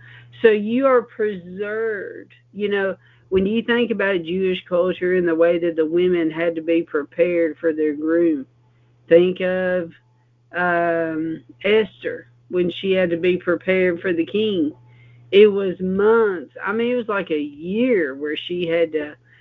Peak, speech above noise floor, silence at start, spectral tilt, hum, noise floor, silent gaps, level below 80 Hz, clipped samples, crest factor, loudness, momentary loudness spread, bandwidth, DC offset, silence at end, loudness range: -2 dBFS; 38 dB; 0.05 s; -9 dB/octave; none; -57 dBFS; none; -56 dBFS; under 0.1%; 18 dB; -20 LUFS; 10 LU; 4.5 kHz; under 0.1%; 0.25 s; 3 LU